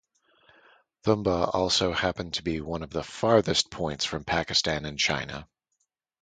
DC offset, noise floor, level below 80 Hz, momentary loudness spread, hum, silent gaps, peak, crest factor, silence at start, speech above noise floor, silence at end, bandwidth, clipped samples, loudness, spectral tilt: under 0.1%; -78 dBFS; -50 dBFS; 9 LU; none; none; -6 dBFS; 22 dB; 1.05 s; 51 dB; 0.75 s; 9.6 kHz; under 0.1%; -26 LUFS; -3.5 dB/octave